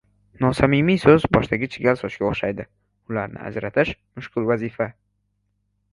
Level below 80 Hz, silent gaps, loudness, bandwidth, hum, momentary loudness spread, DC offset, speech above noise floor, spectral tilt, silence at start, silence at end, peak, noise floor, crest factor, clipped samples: -44 dBFS; none; -21 LUFS; 11.5 kHz; 50 Hz at -45 dBFS; 14 LU; under 0.1%; 50 dB; -7.5 dB/octave; 0.4 s; 1 s; 0 dBFS; -71 dBFS; 22 dB; under 0.1%